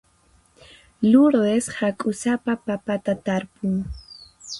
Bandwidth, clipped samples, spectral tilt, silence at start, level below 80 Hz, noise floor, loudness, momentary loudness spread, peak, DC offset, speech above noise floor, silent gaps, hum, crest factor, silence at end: 11.5 kHz; under 0.1%; -6 dB/octave; 1 s; -48 dBFS; -59 dBFS; -22 LUFS; 16 LU; -4 dBFS; under 0.1%; 38 dB; none; none; 18 dB; 0 s